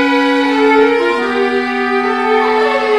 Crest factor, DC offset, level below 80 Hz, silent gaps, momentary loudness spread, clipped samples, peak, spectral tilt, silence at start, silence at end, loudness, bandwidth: 12 dB; 0.4%; -52 dBFS; none; 4 LU; under 0.1%; 0 dBFS; -4 dB/octave; 0 s; 0 s; -13 LUFS; 11 kHz